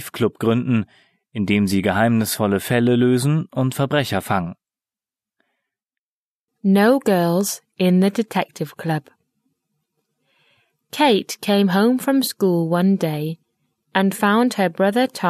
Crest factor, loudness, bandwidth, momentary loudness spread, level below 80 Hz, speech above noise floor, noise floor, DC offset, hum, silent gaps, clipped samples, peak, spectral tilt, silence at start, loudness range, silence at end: 18 dB; -19 LUFS; 14 kHz; 9 LU; -60 dBFS; over 72 dB; under -90 dBFS; under 0.1%; none; 5.98-6.48 s; under 0.1%; -2 dBFS; -6 dB/octave; 0 s; 5 LU; 0 s